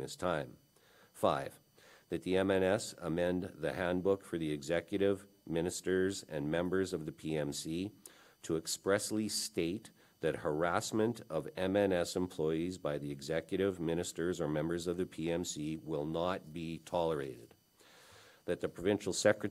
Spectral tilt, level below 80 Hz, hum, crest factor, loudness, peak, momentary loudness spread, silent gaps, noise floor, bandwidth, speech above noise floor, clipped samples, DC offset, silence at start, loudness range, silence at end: -5 dB/octave; -68 dBFS; none; 22 dB; -36 LUFS; -14 dBFS; 9 LU; none; -65 dBFS; 16 kHz; 30 dB; under 0.1%; under 0.1%; 0 s; 3 LU; 0 s